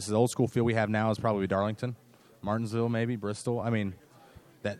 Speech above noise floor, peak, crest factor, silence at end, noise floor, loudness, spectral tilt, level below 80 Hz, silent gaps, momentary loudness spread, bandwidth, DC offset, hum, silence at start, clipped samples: 26 dB; -12 dBFS; 18 dB; 0 s; -55 dBFS; -30 LUFS; -6.5 dB/octave; -64 dBFS; none; 11 LU; 13.5 kHz; under 0.1%; none; 0 s; under 0.1%